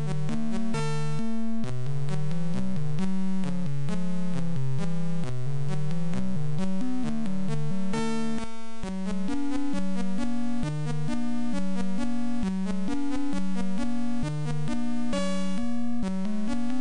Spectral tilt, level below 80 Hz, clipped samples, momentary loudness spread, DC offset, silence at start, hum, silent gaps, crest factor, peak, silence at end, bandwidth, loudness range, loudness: -7 dB/octave; -48 dBFS; under 0.1%; 2 LU; 8%; 0 s; none; none; 14 dB; -16 dBFS; 0 s; 10.5 kHz; 1 LU; -31 LUFS